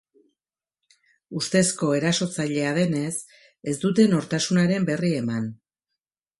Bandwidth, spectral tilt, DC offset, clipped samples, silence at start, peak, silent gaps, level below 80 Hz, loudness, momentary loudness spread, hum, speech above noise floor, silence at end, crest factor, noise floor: 11.5 kHz; -5 dB/octave; under 0.1%; under 0.1%; 1.3 s; -6 dBFS; none; -64 dBFS; -23 LUFS; 11 LU; none; 66 dB; 0.85 s; 18 dB; -89 dBFS